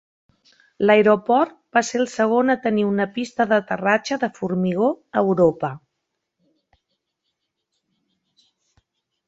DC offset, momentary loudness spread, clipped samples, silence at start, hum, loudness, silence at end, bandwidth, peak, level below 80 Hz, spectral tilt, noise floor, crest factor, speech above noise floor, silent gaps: under 0.1%; 8 LU; under 0.1%; 0.8 s; none; -20 LUFS; 3.5 s; 8 kHz; -2 dBFS; -62 dBFS; -6 dB/octave; -78 dBFS; 20 dB; 59 dB; none